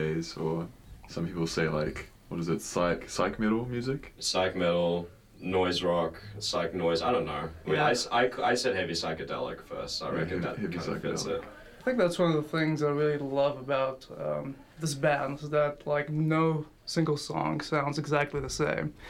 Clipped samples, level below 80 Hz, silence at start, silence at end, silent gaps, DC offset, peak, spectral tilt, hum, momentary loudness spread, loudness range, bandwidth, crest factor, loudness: under 0.1%; -54 dBFS; 0 s; 0 s; none; under 0.1%; -12 dBFS; -5 dB/octave; none; 9 LU; 3 LU; 15.5 kHz; 18 dB; -30 LUFS